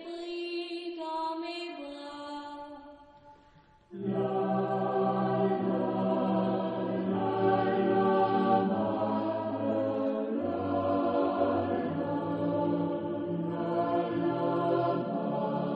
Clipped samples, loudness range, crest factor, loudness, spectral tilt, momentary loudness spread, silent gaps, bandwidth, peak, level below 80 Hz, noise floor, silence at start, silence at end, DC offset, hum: under 0.1%; 10 LU; 16 dB; -30 LUFS; -8.5 dB/octave; 12 LU; none; 8.6 kHz; -14 dBFS; -68 dBFS; -60 dBFS; 0 s; 0 s; under 0.1%; none